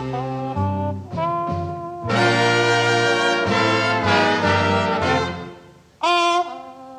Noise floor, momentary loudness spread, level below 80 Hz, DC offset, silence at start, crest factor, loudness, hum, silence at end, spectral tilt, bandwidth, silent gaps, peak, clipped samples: -45 dBFS; 11 LU; -50 dBFS; under 0.1%; 0 s; 16 dB; -19 LUFS; none; 0 s; -5 dB/octave; 12 kHz; none; -4 dBFS; under 0.1%